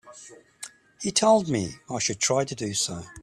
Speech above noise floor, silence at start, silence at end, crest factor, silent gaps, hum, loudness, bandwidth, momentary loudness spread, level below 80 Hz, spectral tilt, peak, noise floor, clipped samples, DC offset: 24 dB; 0.05 s; 0 s; 20 dB; none; none; -25 LUFS; 14 kHz; 21 LU; -60 dBFS; -3.5 dB/octave; -8 dBFS; -49 dBFS; under 0.1%; under 0.1%